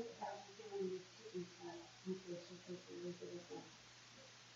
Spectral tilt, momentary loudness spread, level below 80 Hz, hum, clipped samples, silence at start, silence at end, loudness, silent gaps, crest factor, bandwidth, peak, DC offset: -5 dB/octave; 12 LU; -86 dBFS; none; under 0.1%; 0 s; 0 s; -52 LUFS; none; 16 dB; 8 kHz; -34 dBFS; under 0.1%